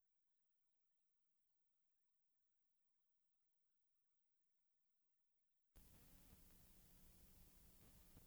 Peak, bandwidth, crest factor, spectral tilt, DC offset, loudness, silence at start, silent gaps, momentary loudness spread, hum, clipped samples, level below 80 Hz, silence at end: -52 dBFS; over 20 kHz; 22 dB; -4 dB/octave; under 0.1%; -69 LUFS; 0 s; none; 1 LU; none; under 0.1%; -78 dBFS; 0 s